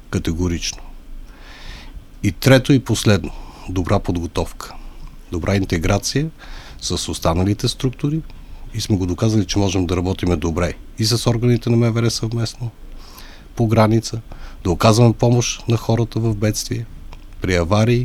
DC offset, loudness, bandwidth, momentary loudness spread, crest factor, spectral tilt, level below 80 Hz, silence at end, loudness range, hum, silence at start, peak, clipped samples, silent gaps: under 0.1%; -19 LUFS; 15 kHz; 20 LU; 18 dB; -5.5 dB/octave; -34 dBFS; 0 s; 4 LU; none; 0.05 s; 0 dBFS; under 0.1%; none